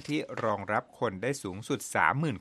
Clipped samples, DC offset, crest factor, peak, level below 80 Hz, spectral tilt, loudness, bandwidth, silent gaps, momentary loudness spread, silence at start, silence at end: under 0.1%; under 0.1%; 22 dB; -8 dBFS; -68 dBFS; -5 dB/octave; -31 LUFS; 13.5 kHz; none; 8 LU; 0 s; 0 s